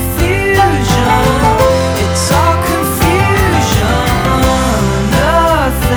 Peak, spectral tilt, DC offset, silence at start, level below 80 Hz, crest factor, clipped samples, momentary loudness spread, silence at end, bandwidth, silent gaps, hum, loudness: 0 dBFS; -5 dB/octave; under 0.1%; 0 s; -20 dBFS; 10 dB; under 0.1%; 3 LU; 0 s; over 20 kHz; none; none; -11 LUFS